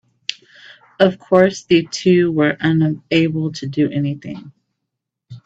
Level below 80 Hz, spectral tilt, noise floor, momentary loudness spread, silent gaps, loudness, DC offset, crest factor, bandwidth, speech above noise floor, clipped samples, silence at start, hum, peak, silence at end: -58 dBFS; -6.5 dB/octave; -79 dBFS; 14 LU; none; -17 LUFS; under 0.1%; 18 dB; 8 kHz; 63 dB; under 0.1%; 0.3 s; none; 0 dBFS; 0.05 s